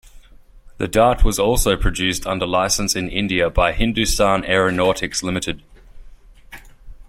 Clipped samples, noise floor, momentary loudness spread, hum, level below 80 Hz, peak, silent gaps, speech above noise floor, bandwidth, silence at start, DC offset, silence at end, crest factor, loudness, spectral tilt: under 0.1%; -44 dBFS; 6 LU; none; -26 dBFS; -2 dBFS; none; 26 dB; 16.5 kHz; 0.15 s; under 0.1%; 0.05 s; 18 dB; -18 LUFS; -3.5 dB/octave